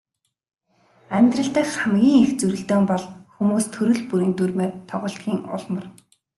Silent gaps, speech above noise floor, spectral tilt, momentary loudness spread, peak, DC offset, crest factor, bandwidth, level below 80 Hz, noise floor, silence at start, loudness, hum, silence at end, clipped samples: none; 38 dB; -6 dB/octave; 12 LU; -4 dBFS; under 0.1%; 16 dB; 12.5 kHz; -62 dBFS; -59 dBFS; 1.1 s; -21 LUFS; none; 0.5 s; under 0.1%